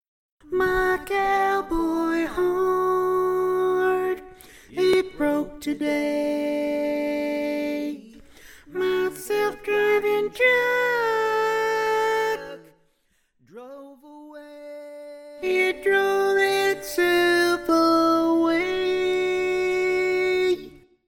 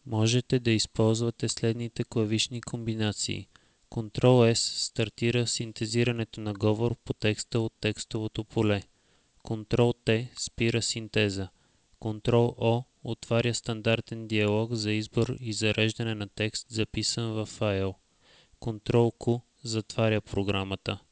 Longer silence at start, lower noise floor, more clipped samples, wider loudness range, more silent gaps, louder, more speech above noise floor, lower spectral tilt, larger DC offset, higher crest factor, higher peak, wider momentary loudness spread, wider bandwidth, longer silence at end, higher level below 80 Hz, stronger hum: first, 0.45 s vs 0.05 s; about the same, -67 dBFS vs -65 dBFS; neither; first, 6 LU vs 3 LU; neither; first, -23 LUFS vs -28 LUFS; first, 45 dB vs 38 dB; about the same, -4 dB/octave vs -5 dB/octave; neither; about the same, 16 dB vs 20 dB; about the same, -8 dBFS vs -8 dBFS; first, 14 LU vs 9 LU; first, 17 kHz vs 8 kHz; first, 0.4 s vs 0.15 s; about the same, -50 dBFS vs -52 dBFS; neither